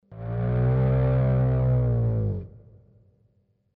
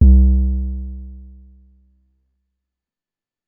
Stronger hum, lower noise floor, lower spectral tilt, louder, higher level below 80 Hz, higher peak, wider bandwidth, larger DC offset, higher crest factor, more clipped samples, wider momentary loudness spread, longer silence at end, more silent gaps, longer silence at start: neither; second, -67 dBFS vs under -90 dBFS; second, -13 dB/octave vs -16.5 dB/octave; second, -24 LUFS vs -17 LUFS; second, -36 dBFS vs -18 dBFS; second, -14 dBFS vs 0 dBFS; first, 3.4 kHz vs 0.8 kHz; neither; second, 10 dB vs 18 dB; neither; second, 10 LU vs 25 LU; second, 1.2 s vs 2.3 s; neither; about the same, 0.1 s vs 0 s